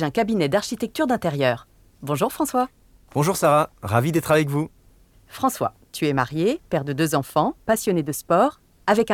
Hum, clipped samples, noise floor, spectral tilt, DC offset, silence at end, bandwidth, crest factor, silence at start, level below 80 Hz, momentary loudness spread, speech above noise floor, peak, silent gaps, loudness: none; under 0.1%; -54 dBFS; -5.5 dB/octave; under 0.1%; 0 s; 18.5 kHz; 18 dB; 0 s; -54 dBFS; 8 LU; 32 dB; -4 dBFS; none; -22 LUFS